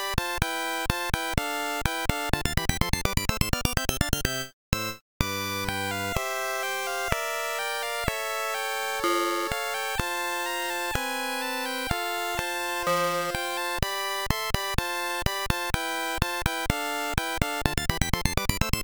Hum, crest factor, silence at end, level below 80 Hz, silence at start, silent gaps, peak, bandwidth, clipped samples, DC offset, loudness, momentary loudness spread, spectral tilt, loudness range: none; 22 dB; 0 s; -36 dBFS; 0 s; 4.53-4.72 s, 5.01-5.20 s; -6 dBFS; over 20 kHz; under 0.1%; 0.2%; -28 LUFS; 3 LU; -3.5 dB/octave; 1 LU